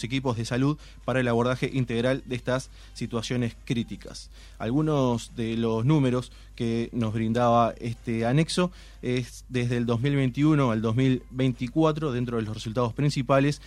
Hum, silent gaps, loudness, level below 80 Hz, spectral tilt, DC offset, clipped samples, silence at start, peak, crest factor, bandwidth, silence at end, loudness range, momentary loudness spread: none; none; -26 LUFS; -48 dBFS; -6.5 dB/octave; under 0.1%; under 0.1%; 0 s; -8 dBFS; 18 dB; 12 kHz; 0 s; 4 LU; 9 LU